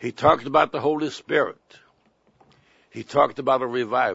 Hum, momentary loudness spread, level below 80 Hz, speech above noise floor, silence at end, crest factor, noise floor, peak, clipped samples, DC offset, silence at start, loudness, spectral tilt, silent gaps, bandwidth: none; 8 LU; -58 dBFS; 41 dB; 0 s; 20 dB; -63 dBFS; -2 dBFS; under 0.1%; under 0.1%; 0 s; -22 LUFS; -5.5 dB/octave; none; 8 kHz